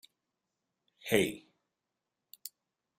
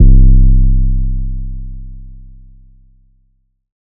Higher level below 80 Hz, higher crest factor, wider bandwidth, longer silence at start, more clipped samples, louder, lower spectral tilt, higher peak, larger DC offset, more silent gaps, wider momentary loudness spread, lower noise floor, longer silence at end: second, -72 dBFS vs -12 dBFS; first, 26 dB vs 10 dB; first, 16 kHz vs 0.6 kHz; first, 1.05 s vs 0 s; neither; second, -31 LUFS vs -14 LUFS; second, -4 dB/octave vs -21 dB/octave; second, -12 dBFS vs 0 dBFS; neither; neither; second, 19 LU vs 24 LU; first, -88 dBFS vs -59 dBFS; second, 0.5 s vs 1.8 s